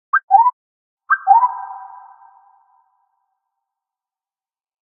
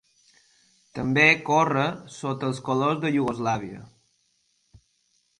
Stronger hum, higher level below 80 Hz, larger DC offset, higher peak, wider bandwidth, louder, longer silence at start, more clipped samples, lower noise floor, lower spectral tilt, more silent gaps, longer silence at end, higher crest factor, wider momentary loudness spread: neither; second, -76 dBFS vs -62 dBFS; neither; first, 0 dBFS vs -4 dBFS; second, 3.3 kHz vs 11 kHz; first, -15 LUFS vs -23 LUFS; second, 0.15 s vs 0.95 s; neither; first, under -90 dBFS vs -69 dBFS; second, -3 dB/octave vs -5.5 dB/octave; first, 0.24-0.28 s, 0.53-0.97 s vs none; first, 3.15 s vs 1.55 s; about the same, 20 dB vs 22 dB; first, 19 LU vs 16 LU